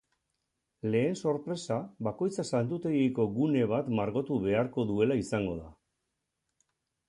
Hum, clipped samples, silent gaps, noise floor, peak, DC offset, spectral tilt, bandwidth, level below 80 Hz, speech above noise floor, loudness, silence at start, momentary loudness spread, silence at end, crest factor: none; under 0.1%; none; -83 dBFS; -14 dBFS; under 0.1%; -7 dB/octave; 11 kHz; -60 dBFS; 54 dB; -31 LUFS; 0.85 s; 6 LU; 1.35 s; 18 dB